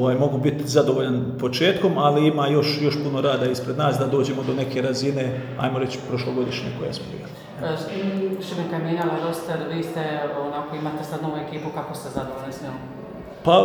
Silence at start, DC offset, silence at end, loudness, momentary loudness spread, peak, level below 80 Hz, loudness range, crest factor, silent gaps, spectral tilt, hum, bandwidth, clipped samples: 0 s; under 0.1%; 0 s; -24 LUFS; 12 LU; -4 dBFS; -56 dBFS; 8 LU; 20 dB; none; -6 dB/octave; none; over 20 kHz; under 0.1%